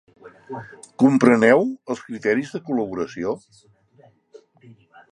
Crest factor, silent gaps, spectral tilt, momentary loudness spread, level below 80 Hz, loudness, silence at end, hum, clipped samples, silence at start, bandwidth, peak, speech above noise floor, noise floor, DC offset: 22 dB; none; -6.5 dB/octave; 21 LU; -64 dBFS; -20 LUFS; 1.75 s; none; under 0.1%; 0.25 s; 11 kHz; 0 dBFS; 35 dB; -55 dBFS; under 0.1%